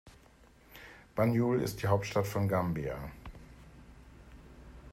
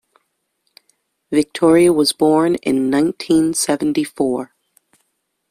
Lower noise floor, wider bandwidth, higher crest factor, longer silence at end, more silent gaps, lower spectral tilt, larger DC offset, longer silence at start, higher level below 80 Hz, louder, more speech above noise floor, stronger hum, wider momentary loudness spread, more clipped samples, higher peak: second, -60 dBFS vs -70 dBFS; about the same, 16 kHz vs 15.5 kHz; first, 20 dB vs 14 dB; second, 0.05 s vs 1.05 s; neither; first, -7 dB/octave vs -4.5 dB/octave; neither; second, 0.05 s vs 1.3 s; about the same, -54 dBFS vs -56 dBFS; second, -32 LUFS vs -16 LUFS; second, 29 dB vs 55 dB; neither; first, 25 LU vs 8 LU; neither; second, -14 dBFS vs -2 dBFS